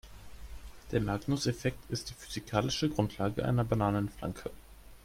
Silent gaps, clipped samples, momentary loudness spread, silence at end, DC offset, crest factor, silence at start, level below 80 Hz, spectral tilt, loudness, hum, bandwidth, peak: none; under 0.1%; 20 LU; 0.05 s; under 0.1%; 22 dB; 0.05 s; -50 dBFS; -6 dB/octave; -33 LUFS; none; 16.5 kHz; -12 dBFS